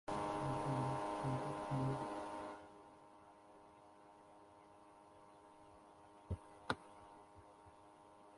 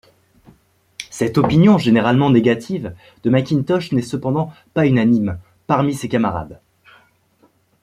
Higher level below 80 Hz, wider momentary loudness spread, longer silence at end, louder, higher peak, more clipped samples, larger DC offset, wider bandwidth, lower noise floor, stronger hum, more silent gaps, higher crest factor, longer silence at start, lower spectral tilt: second, -66 dBFS vs -50 dBFS; first, 22 LU vs 16 LU; second, 0 s vs 1.3 s; second, -44 LUFS vs -17 LUFS; second, -22 dBFS vs -2 dBFS; neither; neither; second, 11.5 kHz vs 14 kHz; first, -63 dBFS vs -58 dBFS; neither; neither; first, 26 dB vs 16 dB; second, 0.05 s vs 1 s; about the same, -6.5 dB/octave vs -7 dB/octave